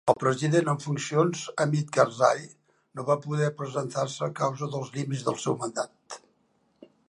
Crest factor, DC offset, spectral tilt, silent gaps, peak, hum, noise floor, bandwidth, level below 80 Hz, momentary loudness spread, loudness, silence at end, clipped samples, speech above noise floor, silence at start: 22 dB; under 0.1%; -5.5 dB/octave; none; -6 dBFS; none; -69 dBFS; 11.5 kHz; -74 dBFS; 11 LU; -27 LUFS; 0.9 s; under 0.1%; 42 dB; 0.05 s